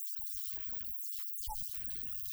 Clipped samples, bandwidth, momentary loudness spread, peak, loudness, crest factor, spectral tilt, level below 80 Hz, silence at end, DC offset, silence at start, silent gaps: under 0.1%; over 20 kHz; 1 LU; -24 dBFS; -37 LUFS; 16 dB; -1 dB/octave; -56 dBFS; 0 s; under 0.1%; 0 s; none